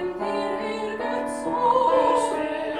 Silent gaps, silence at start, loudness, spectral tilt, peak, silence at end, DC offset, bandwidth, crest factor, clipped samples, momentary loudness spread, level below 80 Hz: none; 0 s; -24 LUFS; -4 dB/octave; -8 dBFS; 0 s; under 0.1%; 12 kHz; 16 dB; under 0.1%; 9 LU; -56 dBFS